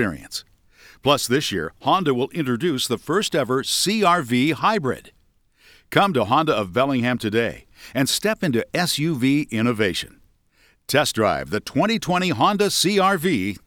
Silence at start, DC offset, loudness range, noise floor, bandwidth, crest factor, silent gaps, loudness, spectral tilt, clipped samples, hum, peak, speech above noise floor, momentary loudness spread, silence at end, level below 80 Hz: 0 s; under 0.1%; 2 LU; -60 dBFS; 19.5 kHz; 20 dB; none; -21 LUFS; -4 dB/octave; under 0.1%; none; 0 dBFS; 39 dB; 7 LU; 0.1 s; -54 dBFS